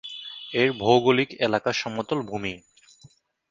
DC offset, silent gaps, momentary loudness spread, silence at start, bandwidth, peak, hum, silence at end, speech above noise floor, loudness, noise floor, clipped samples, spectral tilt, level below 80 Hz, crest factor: under 0.1%; none; 15 LU; 0.05 s; 7.6 kHz; -4 dBFS; none; 0.95 s; 33 dB; -24 LUFS; -56 dBFS; under 0.1%; -5 dB/octave; -60 dBFS; 20 dB